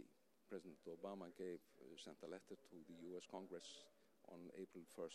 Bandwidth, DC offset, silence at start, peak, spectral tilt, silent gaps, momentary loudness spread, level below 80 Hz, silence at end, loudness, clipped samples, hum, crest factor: 14 kHz; under 0.1%; 0 s; -38 dBFS; -4.5 dB/octave; none; 9 LU; under -90 dBFS; 0 s; -57 LUFS; under 0.1%; none; 20 dB